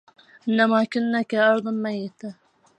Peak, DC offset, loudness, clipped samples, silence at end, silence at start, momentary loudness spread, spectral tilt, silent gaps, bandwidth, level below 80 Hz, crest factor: -6 dBFS; under 0.1%; -22 LUFS; under 0.1%; 0.45 s; 0.45 s; 15 LU; -6.5 dB/octave; none; 8.8 kHz; -78 dBFS; 18 dB